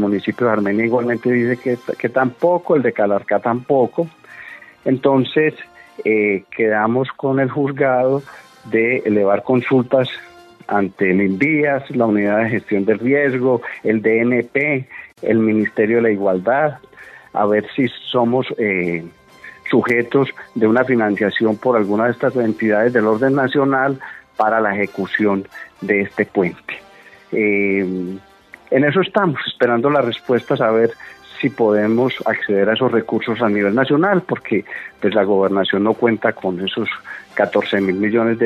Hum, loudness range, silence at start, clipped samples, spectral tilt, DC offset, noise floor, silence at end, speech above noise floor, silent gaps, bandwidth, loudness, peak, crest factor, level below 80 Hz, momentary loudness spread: none; 2 LU; 0 s; under 0.1%; -8 dB/octave; under 0.1%; -38 dBFS; 0 s; 21 dB; none; 7.6 kHz; -17 LUFS; 0 dBFS; 16 dB; -64 dBFS; 8 LU